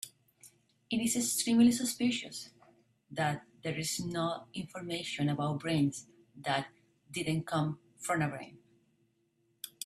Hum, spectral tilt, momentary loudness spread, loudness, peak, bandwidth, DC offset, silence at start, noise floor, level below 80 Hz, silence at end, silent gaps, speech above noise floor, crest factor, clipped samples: none; -4.5 dB/octave; 17 LU; -33 LUFS; -16 dBFS; 15 kHz; under 0.1%; 0.05 s; -75 dBFS; -70 dBFS; 0.15 s; none; 42 dB; 20 dB; under 0.1%